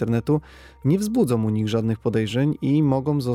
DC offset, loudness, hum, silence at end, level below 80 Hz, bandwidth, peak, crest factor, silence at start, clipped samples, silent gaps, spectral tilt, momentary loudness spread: under 0.1%; -22 LUFS; none; 0 s; -50 dBFS; 15.5 kHz; -8 dBFS; 14 dB; 0 s; under 0.1%; none; -7.5 dB/octave; 3 LU